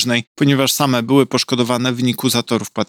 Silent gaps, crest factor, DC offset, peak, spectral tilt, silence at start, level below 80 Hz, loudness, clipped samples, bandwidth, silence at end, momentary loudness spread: 0.27-0.35 s; 16 dB; under 0.1%; 0 dBFS; -4.5 dB/octave; 0 s; -66 dBFS; -16 LUFS; under 0.1%; 18 kHz; 0.05 s; 4 LU